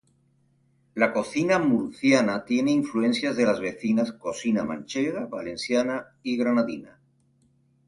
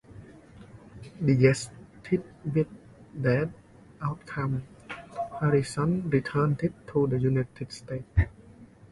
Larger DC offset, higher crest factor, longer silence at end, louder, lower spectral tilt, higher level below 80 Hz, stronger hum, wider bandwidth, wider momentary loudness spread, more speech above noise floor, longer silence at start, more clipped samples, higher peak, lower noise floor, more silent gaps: neither; about the same, 20 dB vs 22 dB; first, 1 s vs 0.25 s; first, -25 LUFS vs -28 LUFS; second, -5 dB/octave vs -7.5 dB/octave; second, -64 dBFS vs -44 dBFS; neither; about the same, 11.5 kHz vs 11.5 kHz; second, 9 LU vs 17 LU; first, 41 dB vs 25 dB; first, 0.95 s vs 0.1 s; neither; about the same, -6 dBFS vs -8 dBFS; first, -65 dBFS vs -51 dBFS; neither